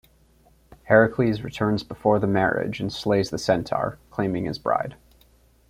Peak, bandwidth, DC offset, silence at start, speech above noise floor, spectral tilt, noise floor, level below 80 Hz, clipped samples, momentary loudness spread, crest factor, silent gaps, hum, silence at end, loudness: -4 dBFS; 15.5 kHz; under 0.1%; 0.85 s; 35 dB; -6.5 dB/octave; -58 dBFS; -52 dBFS; under 0.1%; 9 LU; 20 dB; none; none; 0.75 s; -23 LUFS